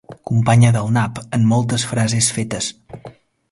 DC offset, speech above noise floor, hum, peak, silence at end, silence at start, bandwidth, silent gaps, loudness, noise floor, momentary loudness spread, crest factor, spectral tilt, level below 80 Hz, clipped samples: under 0.1%; 25 dB; none; -2 dBFS; 0.4 s; 0.1 s; 11.5 kHz; none; -17 LUFS; -41 dBFS; 13 LU; 16 dB; -5 dB/octave; -48 dBFS; under 0.1%